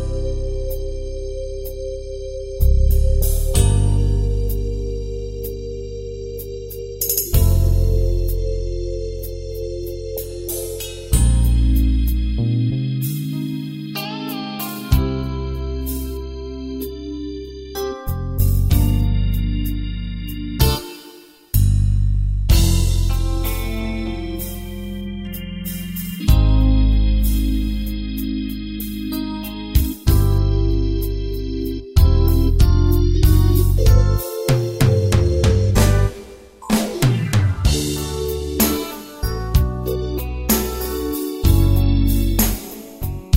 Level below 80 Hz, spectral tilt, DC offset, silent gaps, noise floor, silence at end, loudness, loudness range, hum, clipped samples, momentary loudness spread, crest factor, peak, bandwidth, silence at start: -20 dBFS; -6 dB/octave; under 0.1%; none; -43 dBFS; 0 s; -20 LUFS; 7 LU; none; under 0.1%; 13 LU; 16 dB; -2 dBFS; 16.5 kHz; 0 s